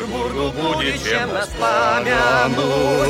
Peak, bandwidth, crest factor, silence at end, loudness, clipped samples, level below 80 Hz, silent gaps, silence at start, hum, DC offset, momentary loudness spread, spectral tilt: -4 dBFS; 16.5 kHz; 14 dB; 0 s; -18 LUFS; under 0.1%; -38 dBFS; none; 0 s; none; under 0.1%; 6 LU; -4 dB/octave